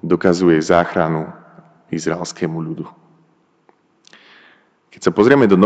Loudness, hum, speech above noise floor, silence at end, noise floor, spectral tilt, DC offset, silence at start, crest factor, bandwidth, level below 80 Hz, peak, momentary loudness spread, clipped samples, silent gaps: -17 LUFS; none; 42 dB; 0 s; -57 dBFS; -6.5 dB/octave; under 0.1%; 0 s; 18 dB; 9 kHz; -52 dBFS; 0 dBFS; 16 LU; under 0.1%; none